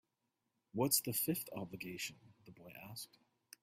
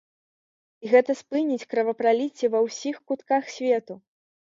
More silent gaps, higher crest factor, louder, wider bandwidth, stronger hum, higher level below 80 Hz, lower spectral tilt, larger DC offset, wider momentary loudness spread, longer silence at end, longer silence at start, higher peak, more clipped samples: neither; first, 26 dB vs 20 dB; second, -39 LUFS vs -24 LUFS; first, 16 kHz vs 7.6 kHz; neither; about the same, -78 dBFS vs -78 dBFS; about the same, -3.5 dB/octave vs -4 dB/octave; neither; first, 21 LU vs 12 LU; about the same, 0.55 s vs 0.55 s; about the same, 0.75 s vs 0.8 s; second, -16 dBFS vs -6 dBFS; neither